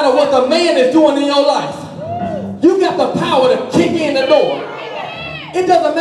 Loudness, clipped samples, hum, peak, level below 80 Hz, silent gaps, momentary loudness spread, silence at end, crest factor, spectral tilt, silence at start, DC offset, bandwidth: -13 LUFS; under 0.1%; none; -2 dBFS; -56 dBFS; none; 13 LU; 0 s; 12 dB; -5 dB/octave; 0 s; under 0.1%; 12 kHz